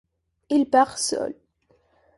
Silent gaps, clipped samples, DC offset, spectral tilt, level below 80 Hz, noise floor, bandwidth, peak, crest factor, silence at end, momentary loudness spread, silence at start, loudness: none; under 0.1%; under 0.1%; -2.5 dB/octave; -64 dBFS; -64 dBFS; 11.5 kHz; -6 dBFS; 18 dB; 0.85 s; 10 LU; 0.5 s; -22 LUFS